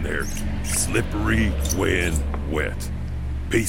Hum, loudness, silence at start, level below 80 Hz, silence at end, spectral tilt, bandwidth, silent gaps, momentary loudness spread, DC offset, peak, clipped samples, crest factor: none; -24 LUFS; 0 s; -26 dBFS; 0 s; -4.5 dB/octave; 17 kHz; none; 9 LU; under 0.1%; -6 dBFS; under 0.1%; 16 dB